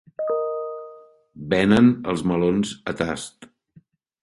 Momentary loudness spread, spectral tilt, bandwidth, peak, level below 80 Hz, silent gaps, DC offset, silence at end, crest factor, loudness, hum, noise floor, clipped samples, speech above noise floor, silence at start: 21 LU; -6 dB/octave; 11.5 kHz; -4 dBFS; -50 dBFS; none; under 0.1%; 0.75 s; 20 dB; -22 LUFS; none; -56 dBFS; under 0.1%; 35 dB; 0.2 s